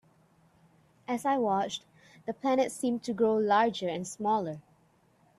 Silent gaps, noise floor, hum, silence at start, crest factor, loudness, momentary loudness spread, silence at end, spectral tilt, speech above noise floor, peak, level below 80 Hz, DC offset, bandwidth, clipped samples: none; -66 dBFS; none; 1.1 s; 18 dB; -30 LUFS; 15 LU; 0.8 s; -4.5 dB/octave; 37 dB; -14 dBFS; -74 dBFS; under 0.1%; 13 kHz; under 0.1%